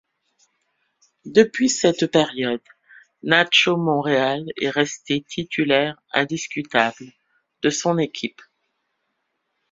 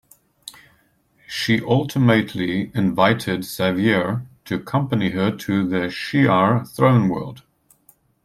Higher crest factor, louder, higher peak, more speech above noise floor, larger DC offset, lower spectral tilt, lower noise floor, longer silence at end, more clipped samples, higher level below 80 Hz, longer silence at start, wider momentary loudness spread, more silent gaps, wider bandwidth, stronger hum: about the same, 22 dB vs 18 dB; about the same, -20 LUFS vs -20 LUFS; about the same, 0 dBFS vs -2 dBFS; first, 54 dB vs 41 dB; neither; second, -3.5 dB/octave vs -6.5 dB/octave; first, -74 dBFS vs -60 dBFS; first, 1.4 s vs 0.85 s; neither; second, -62 dBFS vs -56 dBFS; first, 1.25 s vs 0.45 s; about the same, 10 LU vs 12 LU; neither; second, 7.8 kHz vs 15 kHz; neither